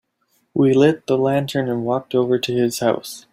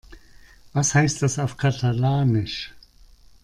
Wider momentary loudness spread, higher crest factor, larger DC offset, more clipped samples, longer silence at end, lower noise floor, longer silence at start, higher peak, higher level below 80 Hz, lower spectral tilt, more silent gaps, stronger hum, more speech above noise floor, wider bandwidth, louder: second, 7 LU vs 11 LU; about the same, 16 dB vs 18 dB; neither; neither; second, 0.15 s vs 0.65 s; first, -66 dBFS vs -50 dBFS; first, 0.55 s vs 0.1 s; first, -2 dBFS vs -6 dBFS; second, -60 dBFS vs -48 dBFS; about the same, -6 dB/octave vs -5 dB/octave; neither; neither; first, 48 dB vs 29 dB; first, 16 kHz vs 11.5 kHz; first, -19 LUFS vs -22 LUFS